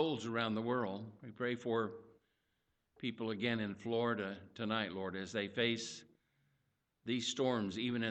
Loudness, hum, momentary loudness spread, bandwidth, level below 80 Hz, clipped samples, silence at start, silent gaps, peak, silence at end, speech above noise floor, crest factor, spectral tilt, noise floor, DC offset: -39 LUFS; none; 9 LU; 8.8 kHz; -76 dBFS; under 0.1%; 0 s; none; -20 dBFS; 0 s; 44 dB; 18 dB; -4.5 dB/octave; -82 dBFS; under 0.1%